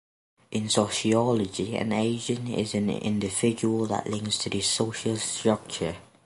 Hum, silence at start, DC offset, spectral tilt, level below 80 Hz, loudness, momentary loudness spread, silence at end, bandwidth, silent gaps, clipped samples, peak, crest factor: none; 0.5 s; under 0.1%; -4.5 dB/octave; -58 dBFS; -27 LUFS; 6 LU; 0.25 s; 11.5 kHz; none; under 0.1%; -6 dBFS; 20 dB